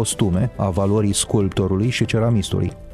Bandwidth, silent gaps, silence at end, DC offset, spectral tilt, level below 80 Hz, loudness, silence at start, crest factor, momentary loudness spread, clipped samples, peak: 13.5 kHz; none; 0 s; under 0.1%; -5.5 dB/octave; -38 dBFS; -20 LUFS; 0 s; 14 dB; 3 LU; under 0.1%; -6 dBFS